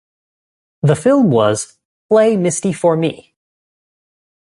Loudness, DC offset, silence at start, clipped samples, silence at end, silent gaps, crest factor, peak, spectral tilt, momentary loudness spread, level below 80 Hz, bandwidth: -15 LUFS; under 0.1%; 0.85 s; under 0.1%; 1.35 s; 1.85-2.09 s; 16 dB; 0 dBFS; -6 dB/octave; 10 LU; -56 dBFS; 11.5 kHz